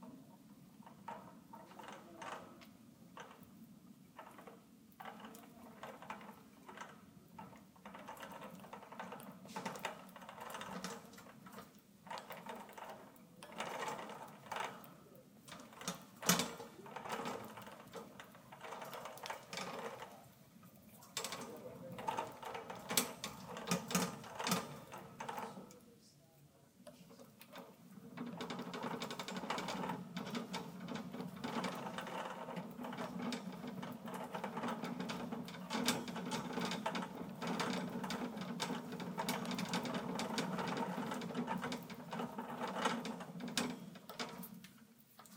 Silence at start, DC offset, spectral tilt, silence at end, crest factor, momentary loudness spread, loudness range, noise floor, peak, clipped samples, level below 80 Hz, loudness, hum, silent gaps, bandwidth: 0 s; under 0.1%; -3.5 dB/octave; 0 s; 30 dB; 19 LU; 13 LU; -66 dBFS; -16 dBFS; under 0.1%; -80 dBFS; -44 LUFS; none; none; 17.5 kHz